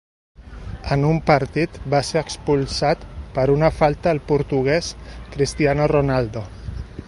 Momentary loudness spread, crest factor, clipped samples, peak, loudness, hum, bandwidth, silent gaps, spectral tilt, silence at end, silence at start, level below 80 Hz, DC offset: 16 LU; 20 dB; under 0.1%; 0 dBFS; -20 LUFS; none; 11.5 kHz; none; -6 dB/octave; 0 s; 0.4 s; -36 dBFS; under 0.1%